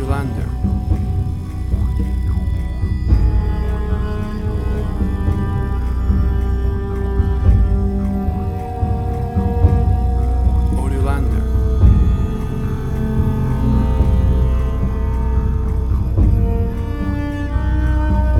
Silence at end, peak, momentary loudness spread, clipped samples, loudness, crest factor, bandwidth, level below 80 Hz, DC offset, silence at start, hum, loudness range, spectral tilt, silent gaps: 0 s; 0 dBFS; 6 LU; under 0.1%; -19 LUFS; 16 dB; 5.6 kHz; -18 dBFS; under 0.1%; 0 s; none; 3 LU; -9 dB/octave; none